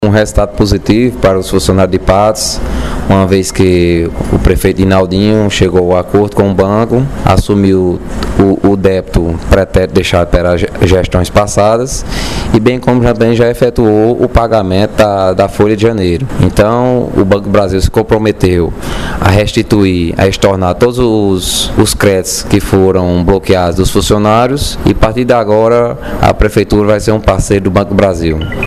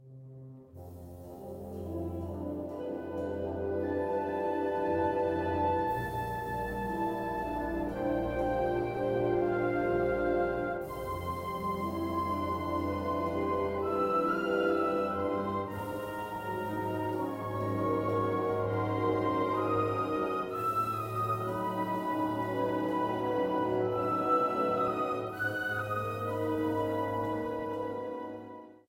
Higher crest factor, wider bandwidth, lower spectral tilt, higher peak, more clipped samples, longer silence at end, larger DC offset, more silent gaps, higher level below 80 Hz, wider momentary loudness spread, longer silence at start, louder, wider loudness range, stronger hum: second, 10 dB vs 16 dB; about the same, 15 kHz vs 16 kHz; second, -6 dB/octave vs -7.5 dB/octave; first, 0 dBFS vs -16 dBFS; first, 0.6% vs under 0.1%; second, 0 s vs 0.15 s; first, 2% vs under 0.1%; neither; first, -20 dBFS vs -54 dBFS; second, 4 LU vs 8 LU; about the same, 0 s vs 0 s; first, -10 LUFS vs -32 LUFS; about the same, 1 LU vs 3 LU; neither